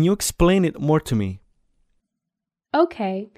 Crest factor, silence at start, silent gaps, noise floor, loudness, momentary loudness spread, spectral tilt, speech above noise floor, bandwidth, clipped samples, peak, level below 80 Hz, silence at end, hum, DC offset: 18 dB; 0 s; none; -85 dBFS; -21 LUFS; 10 LU; -5.5 dB/octave; 65 dB; 15.5 kHz; under 0.1%; -4 dBFS; -38 dBFS; 0.1 s; none; under 0.1%